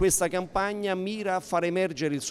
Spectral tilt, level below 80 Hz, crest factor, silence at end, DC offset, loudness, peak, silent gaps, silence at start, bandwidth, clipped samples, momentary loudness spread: -4 dB/octave; -50 dBFS; 14 dB; 0 s; under 0.1%; -28 LUFS; -12 dBFS; none; 0 s; 16 kHz; under 0.1%; 4 LU